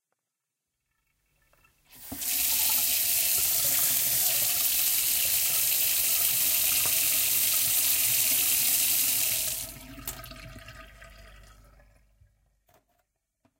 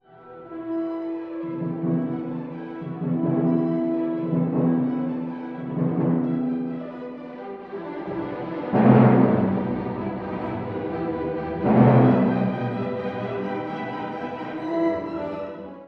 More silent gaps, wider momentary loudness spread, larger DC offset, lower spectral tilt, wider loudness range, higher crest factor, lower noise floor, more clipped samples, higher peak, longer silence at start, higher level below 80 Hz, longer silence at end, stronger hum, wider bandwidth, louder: neither; second, 12 LU vs 16 LU; neither; second, 1 dB/octave vs -11 dB/octave; about the same, 7 LU vs 6 LU; about the same, 22 dB vs 20 dB; first, -85 dBFS vs -44 dBFS; neither; about the same, -6 dBFS vs -4 dBFS; first, 1.95 s vs 0.15 s; about the same, -56 dBFS vs -56 dBFS; first, 2.3 s vs 0 s; neither; first, 16.5 kHz vs 5 kHz; about the same, -22 LUFS vs -24 LUFS